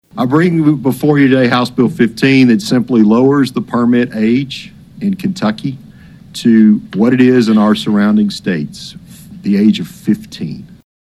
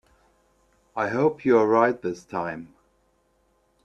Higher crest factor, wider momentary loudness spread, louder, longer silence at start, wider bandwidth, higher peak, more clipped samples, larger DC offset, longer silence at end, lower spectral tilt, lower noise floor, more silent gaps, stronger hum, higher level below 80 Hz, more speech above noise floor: second, 12 dB vs 22 dB; about the same, 15 LU vs 15 LU; first, -12 LUFS vs -23 LUFS; second, 0.15 s vs 0.95 s; first, 13.5 kHz vs 8 kHz; first, 0 dBFS vs -4 dBFS; neither; neither; second, 0.35 s vs 1.2 s; about the same, -7 dB/octave vs -7.5 dB/octave; second, -37 dBFS vs -67 dBFS; neither; neither; first, -50 dBFS vs -66 dBFS; second, 26 dB vs 44 dB